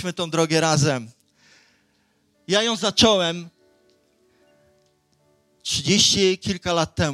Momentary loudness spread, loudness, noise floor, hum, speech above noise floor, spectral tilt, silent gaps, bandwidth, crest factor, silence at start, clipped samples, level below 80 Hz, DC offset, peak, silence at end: 9 LU; -20 LUFS; -65 dBFS; none; 45 dB; -3.5 dB/octave; none; 15 kHz; 20 dB; 0 s; under 0.1%; -52 dBFS; under 0.1%; -2 dBFS; 0 s